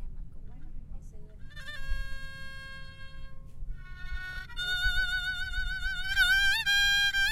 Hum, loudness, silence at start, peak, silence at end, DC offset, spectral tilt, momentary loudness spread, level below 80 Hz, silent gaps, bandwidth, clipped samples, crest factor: none; -28 LUFS; 0 s; -14 dBFS; 0 s; under 0.1%; -0.5 dB/octave; 26 LU; -38 dBFS; none; 16 kHz; under 0.1%; 16 dB